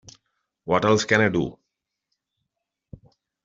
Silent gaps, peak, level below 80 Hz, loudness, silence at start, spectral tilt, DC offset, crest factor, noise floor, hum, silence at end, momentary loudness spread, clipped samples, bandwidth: none; -4 dBFS; -58 dBFS; -21 LUFS; 0.65 s; -4 dB/octave; under 0.1%; 22 dB; -82 dBFS; none; 1.9 s; 13 LU; under 0.1%; 7.8 kHz